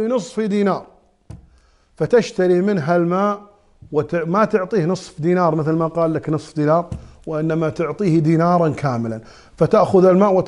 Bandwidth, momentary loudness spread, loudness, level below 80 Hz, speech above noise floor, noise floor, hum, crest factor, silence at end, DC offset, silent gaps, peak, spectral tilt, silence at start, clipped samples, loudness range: 11 kHz; 10 LU; -18 LUFS; -50 dBFS; 37 dB; -54 dBFS; none; 16 dB; 0 s; under 0.1%; none; -2 dBFS; -8 dB/octave; 0 s; under 0.1%; 2 LU